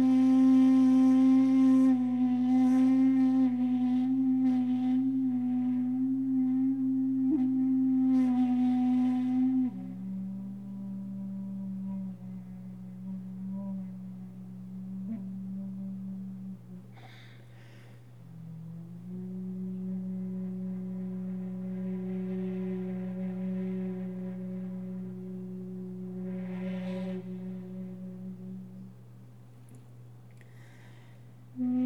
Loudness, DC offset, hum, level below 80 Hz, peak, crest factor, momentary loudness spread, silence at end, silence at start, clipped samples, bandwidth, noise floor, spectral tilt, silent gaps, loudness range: -29 LUFS; 0.1%; none; -74 dBFS; -16 dBFS; 14 dB; 20 LU; 0 s; 0 s; under 0.1%; 6.2 kHz; -52 dBFS; -9 dB/octave; none; 18 LU